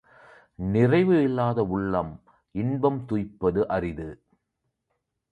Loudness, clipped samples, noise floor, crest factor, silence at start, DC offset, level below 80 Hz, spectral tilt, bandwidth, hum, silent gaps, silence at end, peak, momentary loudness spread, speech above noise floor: -25 LUFS; under 0.1%; -79 dBFS; 18 dB; 0.6 s; under 0.1%; -50 dBFS; -9.5 dB/octave; 8.6 kHz; none; none; 1.15 s; -8 dBFS; 15 LU; 55 dB